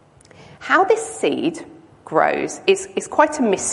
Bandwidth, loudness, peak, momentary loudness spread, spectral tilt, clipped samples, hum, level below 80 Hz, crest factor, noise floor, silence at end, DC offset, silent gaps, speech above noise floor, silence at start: 11.5 kHz; -19 LUFS; -2 dBFS; 8 LU; -3 dB/octave; under 0.1%; none; -58 dBFS; 18 dB; -46 dBFS; 0 s; under 0.1%; none; 28 dB; 0.4 s